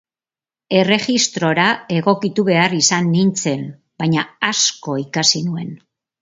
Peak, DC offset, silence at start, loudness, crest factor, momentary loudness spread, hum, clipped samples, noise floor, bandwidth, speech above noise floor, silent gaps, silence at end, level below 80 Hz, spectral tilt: 0 dBFS; under 0.1%; 0.7 s; -16 LUFS; 18 dB; 10 LU; none; under 0.1%; under -90 dBFS; 7.8 kHz; over 73 dB; none; 0.45 s; -62 dBFS; -3.5 dB/octave